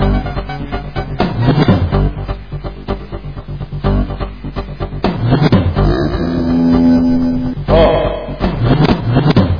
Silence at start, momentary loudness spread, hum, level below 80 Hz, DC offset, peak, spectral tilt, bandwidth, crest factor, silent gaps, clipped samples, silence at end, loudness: 0 s; 14 LU; none; -22 dBFS; 1%; 0 dBFS; -9 dB/octave; 5.2 kHz; 14 dB; none; under 0.1%; 0 s; -14 LUFS